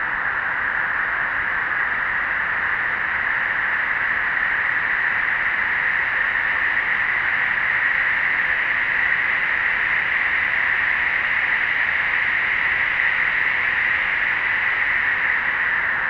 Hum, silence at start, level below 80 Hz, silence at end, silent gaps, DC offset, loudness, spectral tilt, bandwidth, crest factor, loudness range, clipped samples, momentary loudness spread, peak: none; 0 s; -50 dBFS; 0 s; none; under 0.1%; -19 LUFS; -4 dB/octave; 7 kHz; 14 dB; 2 LU; under 0.1%; 3 LU; -6 dBFS